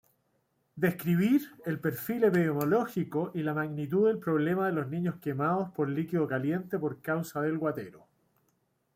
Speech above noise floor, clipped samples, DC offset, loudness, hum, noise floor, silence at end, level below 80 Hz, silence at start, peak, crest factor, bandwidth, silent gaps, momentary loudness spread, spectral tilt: 45 dB; under 0.1%; under 0.1%; -30 LUFS; none; -75 dBFS; 1 s; -72 dBFS; 0.75 s; -14 dBFS; 16 dB; 16.5 kHz; none; 7 LU; -8 dB/octave